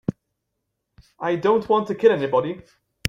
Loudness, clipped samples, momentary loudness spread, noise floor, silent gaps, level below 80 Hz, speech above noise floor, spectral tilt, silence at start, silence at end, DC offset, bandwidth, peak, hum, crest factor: -21 LUFS; under 0.1%; 13 LU; -78 dBFS; none; -56 dBFS; 58 dB; -6 dB/octave; 0.1 s; 0.5 s; under 0.1%; 15 kHz; -2 dBFS; none; 20 dB